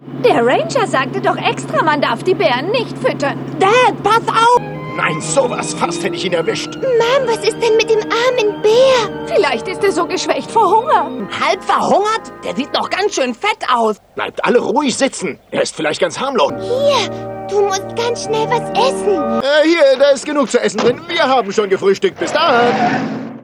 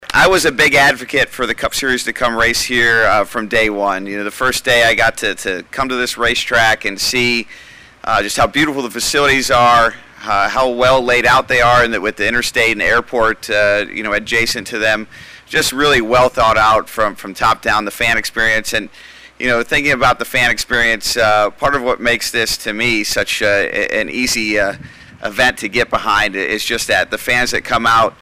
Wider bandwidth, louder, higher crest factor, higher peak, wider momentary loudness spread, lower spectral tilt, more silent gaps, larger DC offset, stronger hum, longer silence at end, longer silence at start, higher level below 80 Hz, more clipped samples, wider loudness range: second, 12.5 kHz vs 16 kHz; about the same, -15 LUFS vs -14 LUFS; about the same, 14 dB vs 10 dB; about the same, -2 dBFS vs -4 dBFS; about the same, 7 LU vs 7 LU; first, -4 dB/octave vs -2.5 dB/octave; neither; neither; neither; about the same, 0 s vs 0.1 s; about the same, 0 s vs 0 s; second, -52 dBFS vs -36 dBFS; neither; about the same, 3 LU vs 3 LU